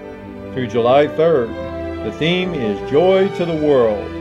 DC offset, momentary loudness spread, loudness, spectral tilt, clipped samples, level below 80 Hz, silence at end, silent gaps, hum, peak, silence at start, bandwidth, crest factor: under 0.1%; 12 LU; -17 LUFS; -7 dB/octave; under 0.1%; -44 dBFS; 0 s; none; none; -2 dBFS; 0 s; 9.2 kHz; 14 dB